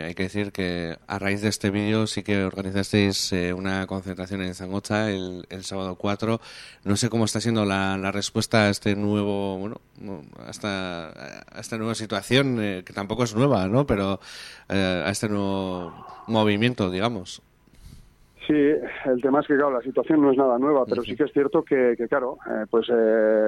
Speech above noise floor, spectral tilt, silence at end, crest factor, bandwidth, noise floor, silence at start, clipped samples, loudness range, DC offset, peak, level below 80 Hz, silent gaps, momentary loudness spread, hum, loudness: 26 dB; -5.5 dB/octave; 0 s; 20 dB; 14.5 kHz; -50 dBFS; 0 s; under 0.1%; 6 LU; under 0.1%; -4 dBFS; -54 dBFS; none; 14 LU; none; -24 LUFS